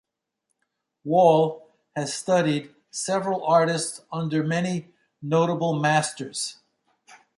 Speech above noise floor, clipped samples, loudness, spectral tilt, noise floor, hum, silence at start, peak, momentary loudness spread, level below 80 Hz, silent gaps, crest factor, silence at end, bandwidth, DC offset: 56 dB; under 0.1%; -24 LUFS; -5 dB/octave; -79 dBFS; none; 1.05 s; -4 dBFS; 13 LU; -70 dBFS; none; 20 dB; 0.2 s; 11.5 kHz; under 0.1%